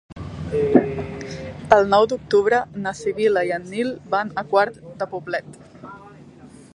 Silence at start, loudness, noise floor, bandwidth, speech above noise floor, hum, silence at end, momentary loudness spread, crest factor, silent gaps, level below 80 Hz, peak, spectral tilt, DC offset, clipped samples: 0.1 s; -21 LUFS; -44 dBFS; 10.5 kHz; 24 dB; none; 0.25 s; 16 LU; 22 dB; none; -48 dBFS; 0 dBFS; -6 dB/octave; under 0.1%; under 0.1%